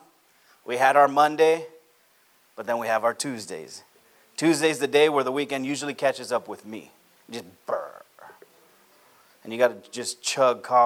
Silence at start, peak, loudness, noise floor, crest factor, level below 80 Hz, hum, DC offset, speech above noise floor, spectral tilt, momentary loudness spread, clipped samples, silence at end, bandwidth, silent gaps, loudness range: 0.65 s; -4 dBFS; -23 LUFS; -61 dBFS; 20 dB; -82 dBFS; none; under 0.1%; 38 dB; -3.5 dB/octave; 20 LU; under 0.1%; 0 s; 17 kHz; none; 9 LU